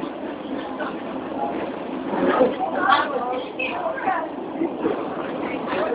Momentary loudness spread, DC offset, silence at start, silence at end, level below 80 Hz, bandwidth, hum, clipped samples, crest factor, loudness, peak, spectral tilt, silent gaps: 11 LU; under 0.1%; 0 s; 0 s; -60 dBFS; 5.2 kHz; none; under 0.1%; 22 dB; -24 LUFS; -2 dBFS; -9.5 dB/octave; none